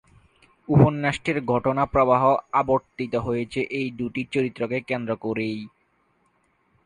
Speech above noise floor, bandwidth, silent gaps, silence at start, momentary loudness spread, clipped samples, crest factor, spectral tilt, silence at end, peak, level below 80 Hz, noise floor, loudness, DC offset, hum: 44 dB; 10 kHz; none; 0.7 s; 10 LU; under 0.1%; 20 dB; -7.5 dB/octave; 1.2 s; -4 dBFS; -50 dBFS; -66 dBFS; -23 LUFS; under 0.1%; none